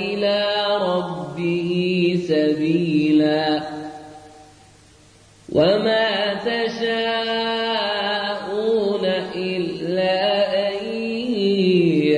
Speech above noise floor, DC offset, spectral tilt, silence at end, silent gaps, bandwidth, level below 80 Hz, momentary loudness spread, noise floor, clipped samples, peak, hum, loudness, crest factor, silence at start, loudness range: 31 dB; under 0.1%; -6.5 dB/octave; 0 s; none; 10.5 kHz; -58 dBFS; 8 LU; -50 dBFS; under 0.1%; -6 dBFS; none; -20 LUFS; 14 dB; 0 s; 2 LU